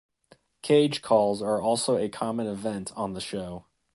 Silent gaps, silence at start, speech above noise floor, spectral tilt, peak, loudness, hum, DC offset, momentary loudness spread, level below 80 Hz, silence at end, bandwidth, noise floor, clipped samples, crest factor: none; 0.65 s; 35 dB; -5 dB/octave; -8 dBFS; -26 LUFS; none; under 0.1%; 13 LU; -60 dBFS; 0.35 s; 11.5 kHz; -61 dBFS; under 0.1%; 20 dB